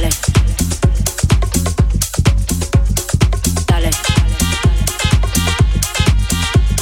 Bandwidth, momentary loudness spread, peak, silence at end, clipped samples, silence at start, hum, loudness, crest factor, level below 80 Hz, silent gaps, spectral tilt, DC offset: 18 kHz; 2 LU; 0 dBFS; 0 s; under 0.1%; 0 s; none; -15 LUFS; 14 dB; -16 dBFS; none; -4.5 dB/octave; under 0.1%